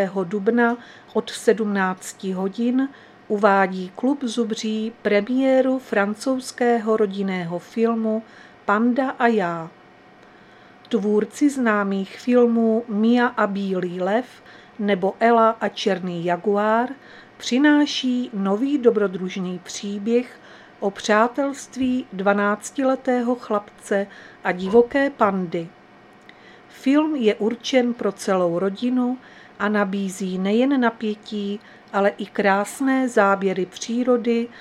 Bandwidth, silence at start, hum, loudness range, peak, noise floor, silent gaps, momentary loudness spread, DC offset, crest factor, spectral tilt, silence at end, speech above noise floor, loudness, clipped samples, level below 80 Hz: 13 kHz; 0 s; none; 3 LU; -2 dBFS; -49 dBFS; none; 10 LU; under 0.1%; 20 dB; -5.5 dB/octave; 0 s; 28 dB; -21 LUFS; under 0.1%; -66 dBFS